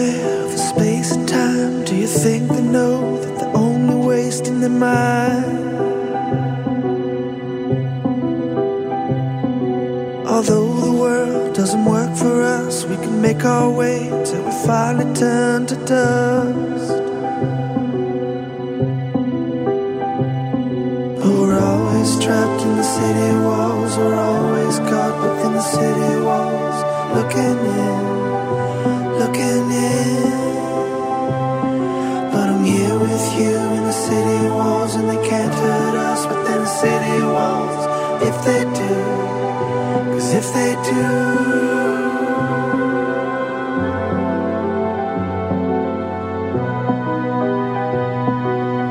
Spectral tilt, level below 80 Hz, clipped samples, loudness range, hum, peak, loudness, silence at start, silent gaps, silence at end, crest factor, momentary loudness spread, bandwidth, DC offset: -6 dB/octave; -54 dBFS; under 0.1%; 4 LU; none; -2 dBFS; -18 LUFS; 0 s; none; 0 s; 16 dB; 5 LU; 16 kHz; under 0.1%